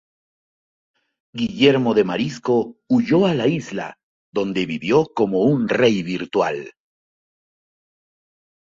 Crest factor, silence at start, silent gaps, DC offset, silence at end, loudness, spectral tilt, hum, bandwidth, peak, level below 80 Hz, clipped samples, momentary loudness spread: 18 dB; 1.35 s; 4.03-4.33 s; under 0.1%; 1.95 s; -19 LUFS; -6.5 dB/octave; none; 7.6 kHz; -2 dBFS; -58 dBFS; under 0.1%; 13 LU